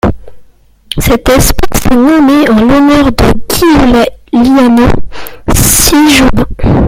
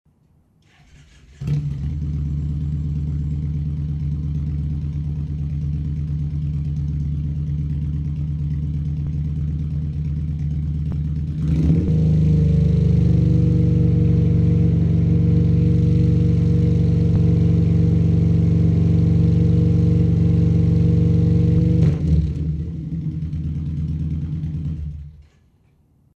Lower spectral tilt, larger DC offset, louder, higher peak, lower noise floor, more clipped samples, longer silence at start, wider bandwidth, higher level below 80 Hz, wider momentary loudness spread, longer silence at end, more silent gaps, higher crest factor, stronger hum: second, -4.5 dB/octave vs -10.5 dB/octave; neither; first, -7 LUFS vs -19 LUFS; first, 0 dBFS vs -4 dBFS; second, -38 dBFS vs -58 dBFS; first, 0.9% vs under 0.1%; second, 0.05 s vs 1.4 s; first, over 20 kHz vs 4.7 kHz; first, -18 dBFS vs -28 dBFS; about the same, 9 LU vs 9 LU; second, 0 s vs 0.95 s; neither; second, 6 dB vs 14 dB; neither